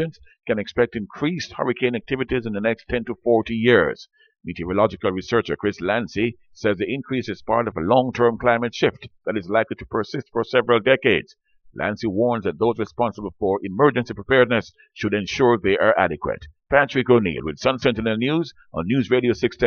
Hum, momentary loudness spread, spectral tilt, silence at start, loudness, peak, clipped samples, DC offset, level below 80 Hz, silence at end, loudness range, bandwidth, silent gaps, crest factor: none; 9 LU; -6.5 dB/octave; 0 s; -21 LUFS; -2 dBFS; under 0.1%; under 0.1%; -48 dBFS; 0 s; 3 LU; 6.8 kHz; none; 20 dB